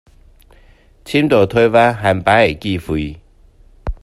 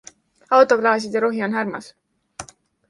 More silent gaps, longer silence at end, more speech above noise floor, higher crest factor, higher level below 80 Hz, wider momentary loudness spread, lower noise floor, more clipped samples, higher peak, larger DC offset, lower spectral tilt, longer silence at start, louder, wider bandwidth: neither; second, 0.1 s vs 0.45 s; first, 33 dB vs 22 dB; about the same, 16 dB vs 18 dB; first, -36 dBFS vs -64 dBFS; second, 14 LU vs 23 LU; first, -47 dBFS vs -40 dBFS; neither; about the same, 0 dBFS vs -2 dBFS; neither; first, -6.5 dB/octave vs -4.5 dB/octave; first, 1.05 s vs 0.5 s; first, -14 LUFS vs -19 LUFS; first, 14 kHz vs 11.5 kHz